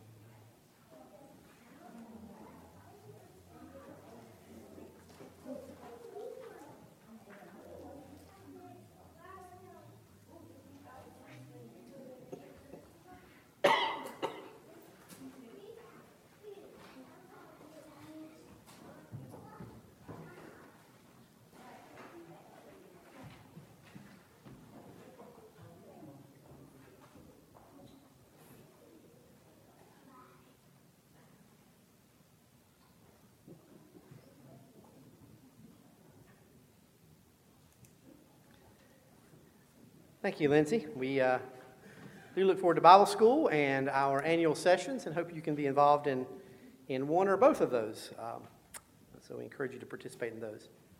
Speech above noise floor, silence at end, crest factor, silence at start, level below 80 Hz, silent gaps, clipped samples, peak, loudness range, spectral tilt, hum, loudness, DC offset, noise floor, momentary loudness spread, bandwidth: 36 dB; 0.4 s; 30 dB; 1.95 s; -76 dBFS; none; under 0.1%; -6 dBFS; 28 LU; -5.5 dB/octave; none; -30 LUFS; under 0.1%; -65 dBFS; 28 LU; 16.5 kHz